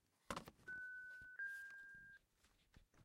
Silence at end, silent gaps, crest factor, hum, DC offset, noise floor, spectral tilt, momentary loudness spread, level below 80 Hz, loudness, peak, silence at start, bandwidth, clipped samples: 0 s; none; 26 dB; none; under 0.1%; -78 dBFS; -3 dB/octave; 11 LU; -76 dBFS; -53 LUFS; -30 dBFS; 0.25 s; 16 kHz; under 0.1%